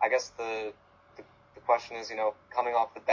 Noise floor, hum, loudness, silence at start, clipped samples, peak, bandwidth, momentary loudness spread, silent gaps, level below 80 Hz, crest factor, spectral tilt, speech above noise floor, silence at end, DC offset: -54 dBFS; none; -31 LUFS; 0 s; under 0.1%; -12 dBFS; 7.6 kHz; 9 LU; none; -70 dBFS; 18 dB; -2.5 dB/octave; 23 dB; 0 s; under 0.1%